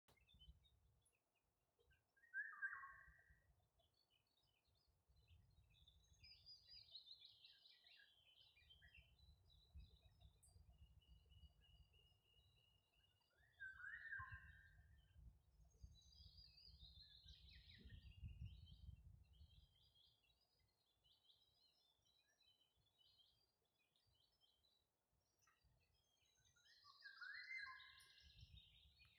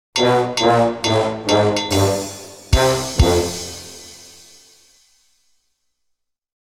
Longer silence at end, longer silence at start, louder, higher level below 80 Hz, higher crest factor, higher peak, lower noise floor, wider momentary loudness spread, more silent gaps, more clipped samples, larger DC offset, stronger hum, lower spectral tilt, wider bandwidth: second, 0 s vs 2.45 s; about the same, 0.1 s vs 0.15 s; second, -60 LUFS vs -17 LUFS; second, -74 dBFS vs -30 dBFS; first, 26 dB vs 18 dB; second, -40 dBFS vs -2 dBFS; first, under -90 dBFS vs -72 dBFS; second, 15 LU vs 19 LU; neither; neither; neither; neither; second, -1 dB/octave vs -4.5 dB/octave; second, 6.6 kHz vs 16.5 kHz